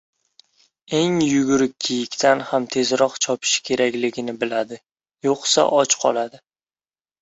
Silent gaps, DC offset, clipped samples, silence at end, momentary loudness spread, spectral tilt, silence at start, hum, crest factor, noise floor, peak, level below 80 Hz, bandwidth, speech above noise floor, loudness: none; under 0.1%; under 0.1%; 0.85 s; 9 LU; -3 dB/octave; 0.9 s; none; 18 dB; under -90 dBFS; -2 dBFS; -62 dBFS; 8.2 kHz; over 70 dB; -20 LUFS